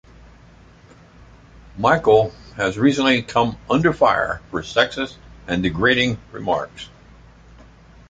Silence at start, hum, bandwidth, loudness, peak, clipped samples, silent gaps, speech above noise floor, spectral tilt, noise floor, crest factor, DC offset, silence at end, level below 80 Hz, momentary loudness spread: 1.75 s; none; 9.2 kHz; -19 LUFS; -2 dBFS; under 0.1%; none; 29 dB; -5.5 dB/octave; -47 dBFS; 20 dB; under 0.1%; 1.25 s; -44 dBFS; 12 LU